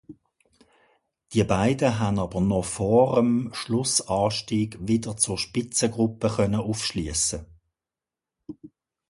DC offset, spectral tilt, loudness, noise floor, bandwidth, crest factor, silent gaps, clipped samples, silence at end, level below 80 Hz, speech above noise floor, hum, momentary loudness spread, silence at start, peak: under 0.1%; -4.5 dB/octave; -24 LUFS; -90 dBFS; 11.5 kHz; 20 dB; none; under 0.1%; 0.4 s; -48 dBFS; 66 dB; none; 7 LU; 0.1 s; -6 dBFS